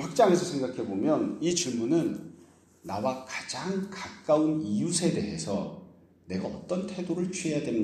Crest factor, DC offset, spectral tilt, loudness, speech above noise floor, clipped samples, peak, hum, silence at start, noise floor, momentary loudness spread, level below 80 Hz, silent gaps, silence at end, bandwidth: 20 dB; under 0.1%; -5 dB/octave; -29 LUFS; 28 dB; under 0.1%; -10 dBFS; none; 0 s; -56 dBFS; 12 LU; -64 dBFS; none; 0 s; 13.5 kHz